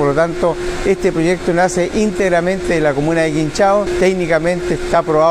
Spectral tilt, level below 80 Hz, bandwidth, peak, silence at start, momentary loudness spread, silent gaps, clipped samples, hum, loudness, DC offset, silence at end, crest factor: -5.5 dB/octave; -32 dBFS; 14 kHz; -2 dBFS; 0 s; 4 LU; none; under 0.1%; none; -15 LUFS; under 0.1%; 0 s; 12 dB